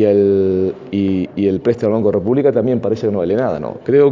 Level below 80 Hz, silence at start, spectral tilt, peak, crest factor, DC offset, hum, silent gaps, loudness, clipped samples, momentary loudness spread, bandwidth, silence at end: -52 dBFS; 0 s; -9.5 dB/octave; -2 dBFS; 14 dB; under 0.1%; none; none; -16 LUFS; under 0.1%; 6 LU; 6.8 kHz; 0 s